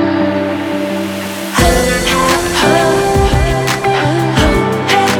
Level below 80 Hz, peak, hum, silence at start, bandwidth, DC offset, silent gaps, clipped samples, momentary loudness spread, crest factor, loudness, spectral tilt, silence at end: -22 dBFS; 0 dBFS; none; 0 s; over 20 kHz; under 0.1%; none; under 0.1%; 6 LU; 12 dB; -13 LUFS; -4.5 dB/octave; 0 s